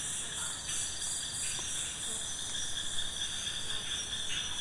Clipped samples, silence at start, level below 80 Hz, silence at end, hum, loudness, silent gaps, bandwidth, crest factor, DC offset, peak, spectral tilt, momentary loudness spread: under 0.1%; 0 s; -54 dBFS; 0 s; none; -34 LUFS; none; 11.5 kHz; 14 dB; under 0.1%; -22 dBFS; 0 dB/octave; 2 LU